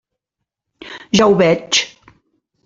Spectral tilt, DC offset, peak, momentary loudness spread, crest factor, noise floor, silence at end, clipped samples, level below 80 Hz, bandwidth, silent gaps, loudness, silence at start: -4 dB/octave; under 0.1%; -2 dBFS; 21 LU; 18 dB; -80 dBFS; 0.8 s; under 0.1%; -52 dBFS; 8.2 kHz; none; -14 LUFS; 0.85 s